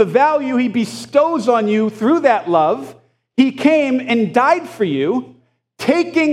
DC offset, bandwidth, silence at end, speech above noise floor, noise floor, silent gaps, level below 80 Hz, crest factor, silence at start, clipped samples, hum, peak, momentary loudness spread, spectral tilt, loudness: under 0.1%; 13 kHz; 0 s; 25 dB; -40 dBFS; none; -70 dBFS; 16 dB; 0 s; under 0.1%; none; 0 dBFS; 7 LU; -6 dB/octave; -16 LUFS